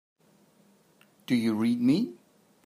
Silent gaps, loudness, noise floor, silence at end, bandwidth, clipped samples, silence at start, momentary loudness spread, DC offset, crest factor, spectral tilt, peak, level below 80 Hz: none; -27 LUFS; -63 dBFS; 0.5 s; 15 kHz; under 0.1%; 1.3 s; 10 LU; under 0.1%; 16 dB; -6.5 dB/octave; -14 dBFS; -76 dBFS